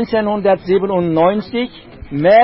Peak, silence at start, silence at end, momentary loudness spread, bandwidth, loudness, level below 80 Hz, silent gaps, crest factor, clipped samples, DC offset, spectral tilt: -2 dBFS; 0 s; 0 s; 9 LU; 5.8 kHz; -16 LUFS; -44 dBFS; none; 12 dB; under 0.1%; under 0.1%; -11.5 dB/octave